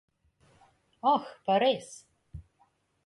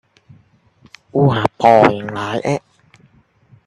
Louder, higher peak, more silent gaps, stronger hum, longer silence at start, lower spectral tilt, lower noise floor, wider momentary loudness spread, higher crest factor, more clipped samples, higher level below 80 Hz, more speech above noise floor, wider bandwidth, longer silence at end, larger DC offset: second, -28 LUFS vs -15 LUFS; second, -14 dBFS vs 0 dBFS; neither; neither; about the same, 1.05 s vs 1.15 s; second, -4.5 dB/octave vs -7 dB/octave; first, -70 dBFS vs -53 dBFS; first, 24 LU vs 13 LU; about the same, 18 dB vs 18 dB; neither; second, -60 dBFS vs -52 dBFS; about the same, 42 dB vs 39 dB; about the same, 11.5 kHz vs 11 kHz; second, 0.65 s vs 1.1 s; neither